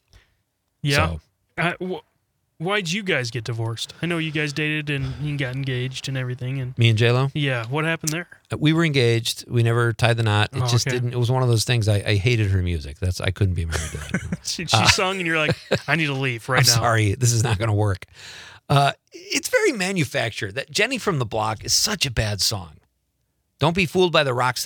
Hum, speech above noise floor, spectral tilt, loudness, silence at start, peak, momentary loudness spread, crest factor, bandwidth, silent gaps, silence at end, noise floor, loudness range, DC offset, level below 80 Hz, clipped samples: none; 50 dB; -4.5 dB/octave; -21 LUFS; 0.85 s; 0 dBFS; 10 LU; 22 dB; 19.5 kHz; none; 0 s; -72 dBFS; 5 LU; under 0.1%; -46 dBFS; under 0.1%